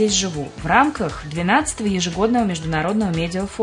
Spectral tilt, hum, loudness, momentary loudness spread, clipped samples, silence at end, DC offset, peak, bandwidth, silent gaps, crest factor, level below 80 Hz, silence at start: -4 dB/octave; none; -20 LUFS; 9 LU; under 0.1%; 0 s; under 0.1%; 0 dBFS; 11 kHz; none; 20 dB; -40 dBFS; 0 s